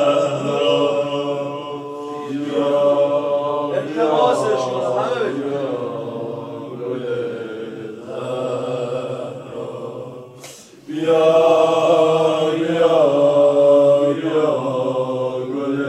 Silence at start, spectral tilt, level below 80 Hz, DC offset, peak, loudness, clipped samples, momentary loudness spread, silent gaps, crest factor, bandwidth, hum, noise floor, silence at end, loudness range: 0 s; -6 dB/octave; -68 dBFS; under 0.1%; -2 dBFS; -18 LUFS; under 0.1%; 16 LU; none; 16 dB; 11.5 kHz; none; -40 dBFS; 0 s; 11 LU